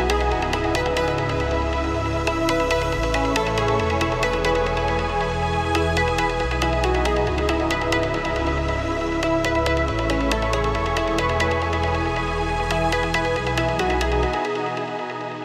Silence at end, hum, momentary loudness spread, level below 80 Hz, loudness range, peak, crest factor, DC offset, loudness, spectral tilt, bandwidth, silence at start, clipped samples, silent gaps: 0 s; none; 3 LU; -30 dBFS; 1 LU; -6 dBFS; 14 dB; under 0.1%; -22 LUFS; -5.5 dB/octave; 14 kHz; 0 s; under 0.1%; none